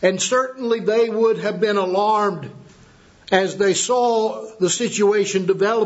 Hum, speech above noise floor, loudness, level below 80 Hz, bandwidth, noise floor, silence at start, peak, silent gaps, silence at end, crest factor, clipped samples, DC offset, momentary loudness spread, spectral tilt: none; 30 dB; -19 LUFS; -64 dBFS; 8.2 kHz; -49 dBFS; 0 s; 0 dBFS; none; 0 s; 18 dB; under 0.1%; under 0.1%; 5 LU; -3.5 dB/octave